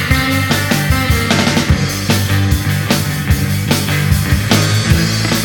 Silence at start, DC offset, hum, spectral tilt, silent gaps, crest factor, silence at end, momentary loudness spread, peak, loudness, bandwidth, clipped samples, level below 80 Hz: 0 s; under 0.1%; none; -4.5 dB/octave; none; 14 dB; 0 s; 3 LU; 0 dBFS; -14 LUFS; 19.5 kHz; under 0.1%; -24 dBFS